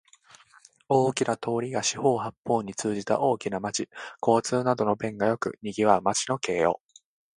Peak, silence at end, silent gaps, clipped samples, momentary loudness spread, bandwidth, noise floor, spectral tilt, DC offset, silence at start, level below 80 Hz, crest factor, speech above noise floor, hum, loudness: -4 dBFS; 0.6 s; 2.39-2.45 s; under 0.1%; 7 LU; 11.5 kHz; -57 dBFS; -4.5 dB/octave; under 0.1%; 0.9 s; -64 dBFS; 22 dB; 31 dB; none; -26 LUFS